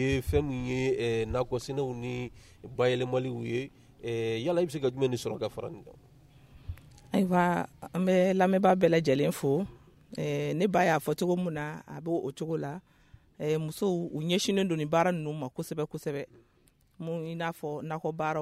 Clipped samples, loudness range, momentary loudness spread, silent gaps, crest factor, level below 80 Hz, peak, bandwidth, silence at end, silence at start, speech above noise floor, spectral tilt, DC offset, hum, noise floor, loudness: under 0.1%; 6 LU; 15 LU; none; 20 dB; -54 dBFS; -12 dBFS; 15.5 kHz; 0 s; 0 s; 36 dB; -6 dB/octave; under 0.1%; none; -65 dBFS; -30 LUFS